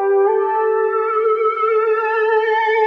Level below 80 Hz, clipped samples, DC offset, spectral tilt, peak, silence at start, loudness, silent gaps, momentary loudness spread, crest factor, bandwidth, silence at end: under -90 dBFS; under 0.1%; under 0.1%; -3 dB/octave; -6 dBFS; 0 s; -16 LUFS; none; 2 LU; 10 dB; 5.2 kHz; 0 s